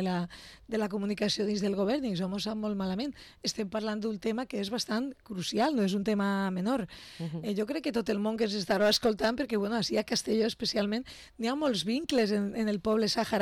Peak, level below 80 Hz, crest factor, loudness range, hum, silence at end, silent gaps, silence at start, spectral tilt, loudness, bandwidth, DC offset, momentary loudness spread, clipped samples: -18 dBFS; -60 dBFS; 12 dB; 4 LU; none; 0 s; none; 0 s; -5 dB/octave; -31 LUFS; 16 kHz; under 0.1%; 8 LU; under 0.1%